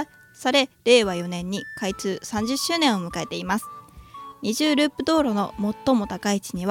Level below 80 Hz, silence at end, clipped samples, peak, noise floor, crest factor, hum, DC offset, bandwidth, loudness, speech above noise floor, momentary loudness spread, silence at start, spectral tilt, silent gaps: -52 dBFS; 0 s; under 0.1%; -6 dBFS; -42 dBFS; 18 dB; none; under 0.1%; 17.5 kHz; -23 LUFS; 19 dB; 12 LU; 0 s; -4 dB/octave; none